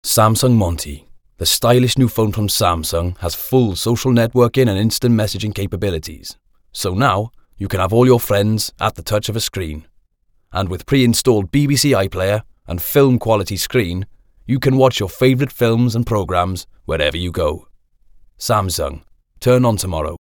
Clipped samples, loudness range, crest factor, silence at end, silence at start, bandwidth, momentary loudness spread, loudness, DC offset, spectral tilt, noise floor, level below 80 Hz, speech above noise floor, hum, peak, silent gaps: under 0.1%; 4 LU; 16 dB; 0.05 s; 0.05 s; 19 kHz; 13 LU; -17 LUFS; under 0.1%; -5 dB/octave; -59 dBFS; -36 dBFS; 43 dB; none; 0 dBFS; none